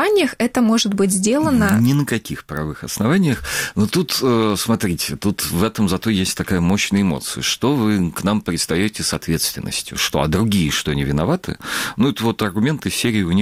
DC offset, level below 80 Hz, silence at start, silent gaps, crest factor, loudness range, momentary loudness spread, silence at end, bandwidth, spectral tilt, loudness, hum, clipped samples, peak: under 0.1%; -40 dBFS; 0 s; none; 16 dB; 2 LU; 6 LU; 0 s; 16.5 kHz; -4.5 dB/octave; -18 LUFS; none; under 0.1%; -2 dBFS